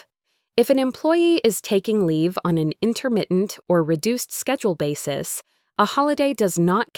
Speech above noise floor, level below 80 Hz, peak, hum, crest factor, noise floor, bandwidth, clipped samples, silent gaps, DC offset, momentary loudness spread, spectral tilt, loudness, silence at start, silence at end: 54 dB; -62 dBFS; -4 dBFS; none; 18 dB; -74 dBFS; 19 kHz; under 0.1%; none; under 0.1%; 7 LU; -5 dB/octave; -21 LUFS; 0.55 s; 0.15 s